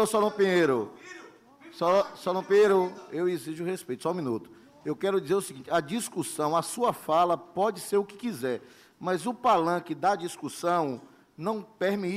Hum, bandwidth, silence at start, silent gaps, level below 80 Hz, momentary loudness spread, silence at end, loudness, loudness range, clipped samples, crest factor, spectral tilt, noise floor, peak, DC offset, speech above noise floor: none; 15.5 kHz; 0 s; none; -72 dBFS; 12 LU; 0 s; -28 LUFS; 4 LU; under 0.1%; 14 dB; -5 dB/octave; -52 dBFS; -14 dBFS; under 0.1%; 24 dB